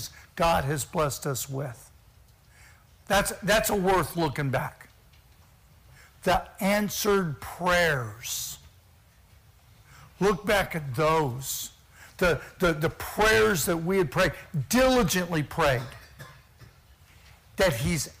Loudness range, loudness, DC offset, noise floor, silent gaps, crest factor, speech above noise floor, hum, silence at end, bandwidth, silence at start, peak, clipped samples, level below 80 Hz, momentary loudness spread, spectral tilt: 5 LU; -26 LUFS; under 0.1%; -57 dBFS; none; 18 dB; 31 dB; none; 0.1 s; 16 kHz; 0 s; -10 dBFS; under 0.1%; -46 dBFS; 11 LU; -4 dB/octave